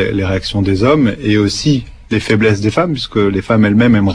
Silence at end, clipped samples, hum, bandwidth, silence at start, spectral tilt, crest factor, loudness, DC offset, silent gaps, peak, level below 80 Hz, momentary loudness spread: 0 s; under 0.1%; none; 10.5 kHz; 0 s; -6.5 dB/octave; 12 dB; -13 LUFS; under 0.1%; none; 0 dBFS; -34 dBFS; 6 LU